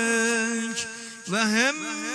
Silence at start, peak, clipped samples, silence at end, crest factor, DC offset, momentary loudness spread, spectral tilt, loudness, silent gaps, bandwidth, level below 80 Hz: 0 s; -8 dBFS; under 0.1%; 0 s; 18 dB; under 0.1%; 10 LU; -2 dB/octave; -24 LUFS; none; 11 kHz; -72 dBFS